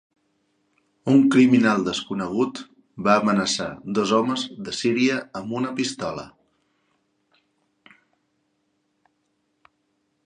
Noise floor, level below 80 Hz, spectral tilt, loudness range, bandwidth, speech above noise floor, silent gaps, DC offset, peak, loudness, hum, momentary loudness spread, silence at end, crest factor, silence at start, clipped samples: -71 dBFS; -64 dBFS; -5 dB/octave; 12 LU; 10 kHz; 50 dB; none; under 0.1%; -2 dBFS; -22 LUFS; none; 14 LU; 4 s; 22 dB; 1.05 s; under 0.1%